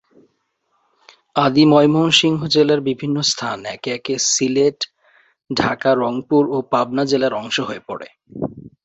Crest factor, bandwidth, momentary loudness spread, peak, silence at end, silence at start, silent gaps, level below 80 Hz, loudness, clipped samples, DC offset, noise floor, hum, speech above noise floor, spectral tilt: 18 dB; 8.2 kHz; 15 LU; 0 dBFS; 0.15 s; 1.35 s; none; -56 dBFS; -17 LUFS; under 0.1%; under 0.1%; -68 dBFS; none; 50 dB; -4 dB/octave